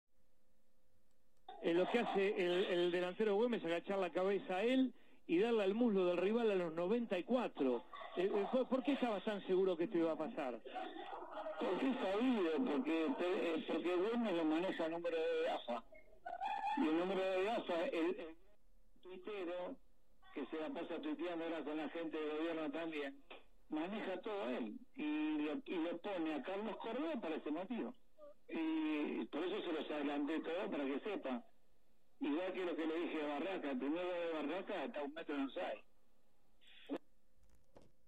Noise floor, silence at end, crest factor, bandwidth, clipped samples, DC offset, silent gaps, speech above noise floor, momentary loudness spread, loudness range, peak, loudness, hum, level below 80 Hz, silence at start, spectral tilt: -79 dBFS; 1.1 s; 16 dB; 10 kHz; under 0.1%; 0.1%; none; 39 dB; 11 LU; 7 LU; -24 dBFS; -40 LUFS; none; -78 dBFS; 0.05 s; -6.5 dB/octave